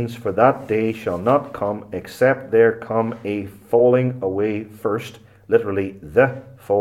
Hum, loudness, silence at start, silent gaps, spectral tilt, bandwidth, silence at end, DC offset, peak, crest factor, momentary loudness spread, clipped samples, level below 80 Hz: none; -20 LUFS; 0 s; none; -7.5 dB/octave; 14.5 kHz; 0 s; under 0.1%; -2 dBFS; 18 dB; 10 LU; under 0.1%; -58 dBFS